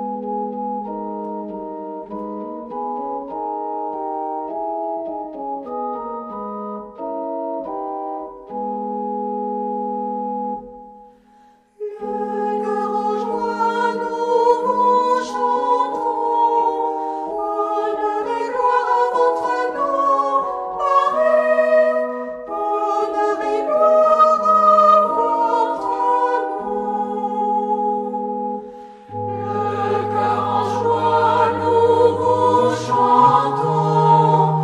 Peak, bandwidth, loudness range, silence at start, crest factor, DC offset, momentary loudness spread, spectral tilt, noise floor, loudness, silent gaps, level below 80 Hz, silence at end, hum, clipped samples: -2 dBFS; 10.5 kHz; 12 LU; 0 s; 18 dB; under 0.1%; 15 LU; -6.5 dB/octave; -52 dBFS; -19 LUFS; none; -60 dBFS; 0 s; none; under 0.1%